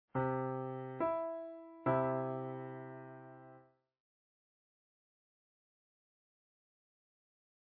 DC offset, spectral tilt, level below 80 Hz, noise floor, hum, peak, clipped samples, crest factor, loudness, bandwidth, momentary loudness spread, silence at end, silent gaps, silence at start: under 0.1%; -8 dB/octave; -76 dBFS; -64 dBFS; none; -22 dBFS; under 0.1%; 22 dB; -39 LUFS; 4.4 kHz; 19 LU; 4 s; none; 0.15 s